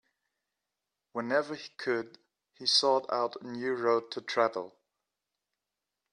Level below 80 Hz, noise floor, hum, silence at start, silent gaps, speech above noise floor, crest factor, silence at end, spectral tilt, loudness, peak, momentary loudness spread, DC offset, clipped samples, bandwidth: -84 dBFS; -88 dBFS; 50 Hz at -80 dBFS; 1.15 s; none; 58 dB; 20 dB; 1.45 s; -2.5 dB/octave; -30 LUFS; -12 dBFS; 15 LU; under 0.1%; under 0.1%; 11.5 kHz